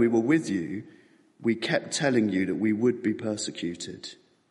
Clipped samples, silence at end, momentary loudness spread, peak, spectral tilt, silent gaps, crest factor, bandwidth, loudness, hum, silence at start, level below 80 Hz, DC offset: under 0.1%; 0.35 s; 13 LU; -10 dBFS; -5 dB/octave; none; 16 dB; 11.5 kHz; -27 LUFS; none; 0 s; -70 dBFS; under 0.1%